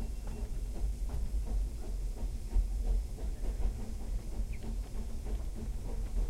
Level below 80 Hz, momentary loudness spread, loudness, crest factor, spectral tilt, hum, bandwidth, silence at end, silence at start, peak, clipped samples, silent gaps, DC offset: -34 dBFS; 5 LU; -40 LUFS; 16 dB; -6.5 dB/octave; none; 13 kHz; 0 s; 0 s; -20 dBFS; under 0.1%; none; under 0.1%